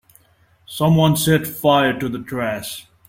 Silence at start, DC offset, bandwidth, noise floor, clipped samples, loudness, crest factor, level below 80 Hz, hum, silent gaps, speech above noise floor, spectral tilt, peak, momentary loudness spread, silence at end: 0.7 s; under 0.1%; 16.5 kHz; -57 dBFS; under 0.1%; -18 LUFS; 16 dB; -50 dBFS; none; none; 39 dB; -5.5 dB/octave; -2 dBFS; 12 LU; 0.3 s